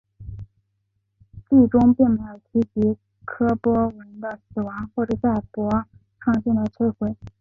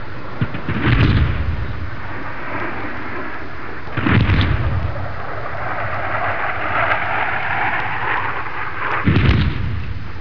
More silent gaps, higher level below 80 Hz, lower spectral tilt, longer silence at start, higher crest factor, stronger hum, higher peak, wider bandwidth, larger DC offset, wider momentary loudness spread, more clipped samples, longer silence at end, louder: neither; second, -46 dBFS vs -28 dBFS; first, -10.5 dB/octave vs -8 dB/octave; first, 0.2 s vs 0 s; about the same, 18 dB vs 18 dB; neither; second, -4 dBFS vs 0 dBFS; second, 3.8 kHz vs 5.4 kHz; second, under 0.1% vs 7%; first, 18 LU vs 13 LU; neither; about the same, 0.1 s vs 0 s; about the same, -22 LUFS vs -20 LUFS